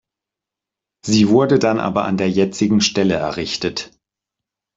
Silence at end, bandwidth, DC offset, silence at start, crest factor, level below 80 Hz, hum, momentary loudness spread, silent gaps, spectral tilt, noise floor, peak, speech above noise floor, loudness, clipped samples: 0.9 s; 7.8 kHz; under 0.1%; 1.05 s; 16 dB; -54 dBFS; none; 10 LU; none; -5 dB/octave; -86 dBFS; -2 dBFS; 69 dB; -17 LUFS; under 0.1%